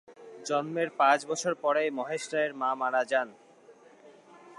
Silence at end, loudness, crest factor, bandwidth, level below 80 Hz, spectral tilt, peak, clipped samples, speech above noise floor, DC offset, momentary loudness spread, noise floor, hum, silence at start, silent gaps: 0.05 s; -29 LUFS; 20 dB; 11.5 kHz; -88 dBFS; -3.5 dB/octave; -12 dBFS; under 0.1%; 27 dB; under 0.1%; 8 LU; -56 dBFS; none; 0.1 s; none